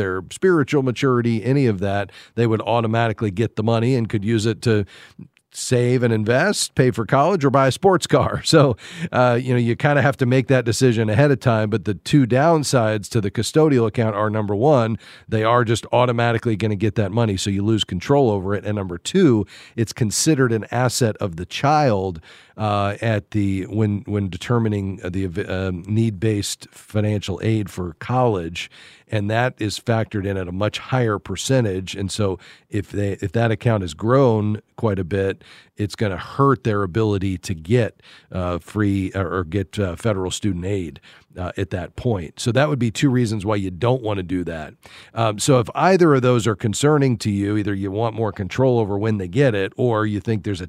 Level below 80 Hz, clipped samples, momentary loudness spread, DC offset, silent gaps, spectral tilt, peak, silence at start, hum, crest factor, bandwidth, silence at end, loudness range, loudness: -50 dBFS; under 0.1%; 9 LU; under 0.1%; none; -6 dB/octave; -2 dBFS; 0 s; none; 18 dB; 14.5 kHz; 0 s; 5 LU; -20 LUFS